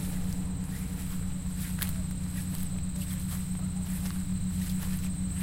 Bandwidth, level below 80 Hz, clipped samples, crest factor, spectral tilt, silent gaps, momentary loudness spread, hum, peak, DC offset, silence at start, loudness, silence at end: 17 kHz; -40 dBFS; under 0.1%; 20 dB; -5.5 dB/octave; none; 3 LU; none; -12 dBFS; under 0.1%; 0 s; -34 LUFS; 0 s